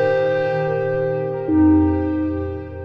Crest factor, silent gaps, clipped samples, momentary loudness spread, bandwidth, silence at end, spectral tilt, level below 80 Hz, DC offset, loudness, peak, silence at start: 12 dB; none; under 0.1%; 9 LU; 5.4 kHz; 0 s; -10 dB/octave; -40 dBFS; under 0.1%; -19 LUFS; -6 dBFS; 0 s